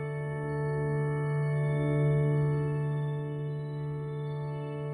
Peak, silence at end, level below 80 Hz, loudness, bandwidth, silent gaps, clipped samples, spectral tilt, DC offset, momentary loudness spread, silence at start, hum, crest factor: -18 dBFS; 0 s; -58 dBFS; -31 LUFS; 9.8 kHz; none; under 0.1%; -9.5 dB/octave; under 0.1%; 9 LU; 0 s; none; 12 dB